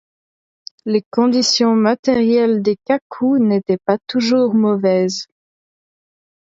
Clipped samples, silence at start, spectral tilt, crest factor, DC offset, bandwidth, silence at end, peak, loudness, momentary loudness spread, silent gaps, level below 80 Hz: under 0.1%; 0.85 s; -5 dB/octave; 14 dB; under 0.1%; 7.8 kHz; 1.25 s; -2 dBFS; -16 LUFS; 7 LU; 1.06-1.11 s, 1.99-2.03 s, 3.02-3.10 s; -60 dBFS